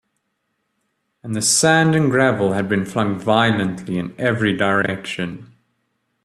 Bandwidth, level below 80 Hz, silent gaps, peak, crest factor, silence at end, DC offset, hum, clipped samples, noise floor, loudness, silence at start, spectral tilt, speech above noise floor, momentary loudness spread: 14.5 kHz; -56 dBFS; none; -2 dBFS; 18 dB; 0.8 s; under 0.1%; none; under 0.1%; -72 dBFS; -18 LUFS; 1.25 s; -4 dB/octave; 54 dB; 12 LU